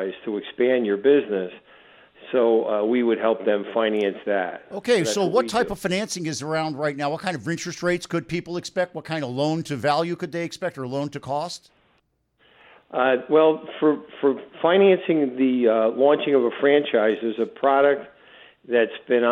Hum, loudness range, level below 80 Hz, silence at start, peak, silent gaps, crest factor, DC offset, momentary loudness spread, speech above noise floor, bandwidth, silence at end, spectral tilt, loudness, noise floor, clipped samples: none; 7 LU; -62 dBFS; 0 s; -4 dBFS; none; 18 dB; under 0.1%; 10 LU; 45 dB; 14 kHz; 0 s; -5 dB/octave; -22 LUFS; -67 dBFS; under 0.1%